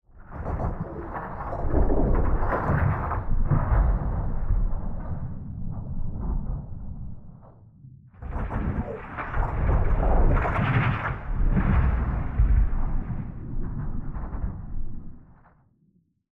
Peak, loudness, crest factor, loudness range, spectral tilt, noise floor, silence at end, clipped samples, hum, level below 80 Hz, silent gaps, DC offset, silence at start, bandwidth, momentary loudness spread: -10 dBFS; -28 LUFS; 16 dB; 11 LU; -10 dB/octave; -65 dBFS; 1.1 s; under 0.1%; none; -26 dBFS; none; under 0.1%; 0.15 s; 3.7 kHz; 14 LU